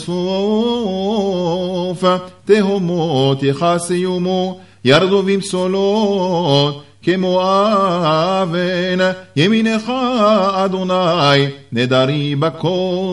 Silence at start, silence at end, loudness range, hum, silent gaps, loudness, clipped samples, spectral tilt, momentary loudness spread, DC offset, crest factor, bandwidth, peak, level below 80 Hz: 0 s; 0 s; 2 LU; none; none; -16 LUFS; under 0.1%; -6 dB/octave; 6 LU; 0.3%; 16 dB; 11.5 kHz; 0 dBFS; -56 dBFS